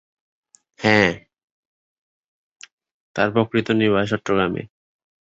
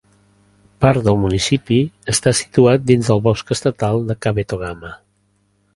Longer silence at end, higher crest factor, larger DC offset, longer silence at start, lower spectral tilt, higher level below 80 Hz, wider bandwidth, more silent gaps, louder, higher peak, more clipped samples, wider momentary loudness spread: second, 0.55 s vs 0.8 s; about the same, 22 dB vs 18 dB; neither; about the same, 0.8 s vs 0.8 s; about the same, -6 dB/octave vs -5.5 dB/octave; second, -54 dBFS vs -40 dBFS; second, 8 kHz vs 11.5 kHz; first, 1.43-2.56 s, 2.72-2.78 s, 2.91-3.15 s vs none; second, -19 LUFS vs -16 LUFS; about the same, -2 dBFS vs 0 dBFS; neither; about the same, 12 LU vs 10 LU